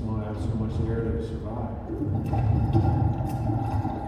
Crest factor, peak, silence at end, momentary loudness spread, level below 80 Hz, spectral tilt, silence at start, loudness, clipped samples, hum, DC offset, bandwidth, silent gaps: 16 dB; -10 dBFS; 0 s; 9 LU; -34 dBFS; -9.5 dB/octave; 0 s; -27 LUFS; under 0.1%; none; under 0.1%; 8.6 kHz; none